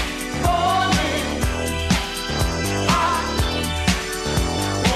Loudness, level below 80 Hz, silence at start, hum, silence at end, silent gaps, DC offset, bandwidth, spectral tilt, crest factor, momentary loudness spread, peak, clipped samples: -21 LUFS; -30 dBFS; 0 s; none; 0 s; none; under 0.1%; 14.5 kHz; -4 dB/octave; 14 dB; 4 LU; -6 dBFS; under 0.1%